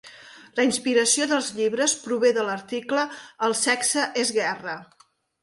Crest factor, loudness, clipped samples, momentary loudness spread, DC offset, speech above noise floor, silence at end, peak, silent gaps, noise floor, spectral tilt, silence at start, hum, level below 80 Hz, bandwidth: 16 dB; -23 LUFS; under 0.1%; 10 LU; under 0.1%; 23 dB; 0.6 s; -8 dBFS; none; -47 dBFS; -1.5 dB/octave; 0.05 s; none; -72 dBFS; 11.5 kHz